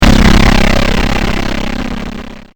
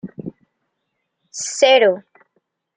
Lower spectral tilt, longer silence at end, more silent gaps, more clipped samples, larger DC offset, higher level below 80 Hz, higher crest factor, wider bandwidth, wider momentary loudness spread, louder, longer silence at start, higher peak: first, -5 dB/octave vs -2 dB/octave; second, 0.15 s vs 0.75 s; neither; first, 1% vs under 0.1%; neither; first, -14 dBFS vs -68 dBFS; second, 10 dB vs 18 dB; first, over 20 kHz vs 9.6 kHz; second, 15 LU vs 22 LU; first, -12 LUFS vs -15 LUFS; about the same, 0 s vs 0.05 s; about the same, 0 dBFS vs -2 dBFS